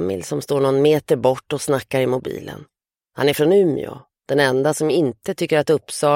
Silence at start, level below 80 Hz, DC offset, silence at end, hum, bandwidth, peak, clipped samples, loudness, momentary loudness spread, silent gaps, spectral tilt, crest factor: 0 s; -58 dBFS; under 0.1%; 0 s; none; 16.5 kHz; -4 dBFS; under 0.1%; -19 LUFS; 13 LU; none; -5.5 dB/octave; 16 dB